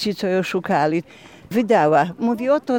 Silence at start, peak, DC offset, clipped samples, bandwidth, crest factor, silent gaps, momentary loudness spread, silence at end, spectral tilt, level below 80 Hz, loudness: 0 s; -4 dBFS; under 0.1%; under 0.1%; 17.5 kHz; 14 dB; none; 8 LU; 0 s; -6 dB/octave; -62 dBFS; -19 LUFS